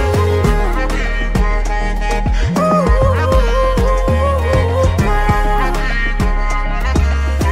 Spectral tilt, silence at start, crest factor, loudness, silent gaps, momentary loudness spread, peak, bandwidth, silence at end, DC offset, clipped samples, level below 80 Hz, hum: -6.5 dB/octave; 0 s; 10 dB; -16 LUFS; none; 5 LU; -2 dBFS; 14 kHz; 0 s; under 0.1%; under 0.1%; -16 dBFS; none